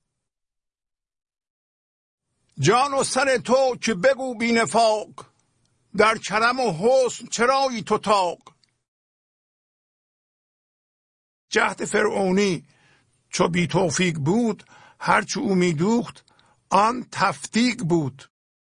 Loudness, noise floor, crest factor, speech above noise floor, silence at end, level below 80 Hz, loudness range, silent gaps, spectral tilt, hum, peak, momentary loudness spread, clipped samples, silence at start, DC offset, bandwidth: -21 LUFS; -89 dBFS; 20 dB; 68 dB; 0.5 s; -60 dBFS; 6 LU; 8.88-11.48 s; -4.5 dB/octave; none; -4 dBFS; 6 LU; under 0.1%; 2.55 s; under 0.1%; 10.5 kHz